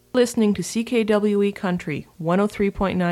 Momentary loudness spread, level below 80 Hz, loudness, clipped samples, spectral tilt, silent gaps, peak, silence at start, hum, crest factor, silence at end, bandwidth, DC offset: 7 LU; -46 dBFS; -22 LUFS; under 0.1%; -6 dB/octave; none; -6 dBFS; 0.15 s; none; 14 dB; 0 s; 14 kHz; under 0.1%